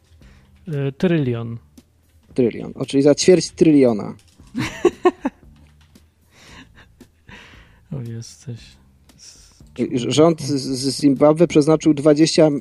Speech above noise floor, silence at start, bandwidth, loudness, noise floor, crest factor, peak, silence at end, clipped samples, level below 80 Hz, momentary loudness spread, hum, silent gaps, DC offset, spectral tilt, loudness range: 38 dB; 0.65 s; 12 kHz; -17 LUFS; -55 dBFS; 18 dB; -2 dBFS; 0 s; under 0.1%; -52 dBFS; 20 LU; none; none; under 0.1%; -6 dB/octave; 20 LU